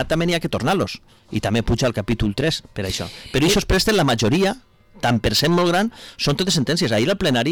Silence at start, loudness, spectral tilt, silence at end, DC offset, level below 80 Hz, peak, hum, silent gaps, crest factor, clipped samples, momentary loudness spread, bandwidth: 0 s; -20 LUFS; -4.5 dB/octave; 0 s; under 0.1%; -36 dBFS; -10 dBFS; none; none; 8 dB; under 0.1%; 9 LU; 19 kHz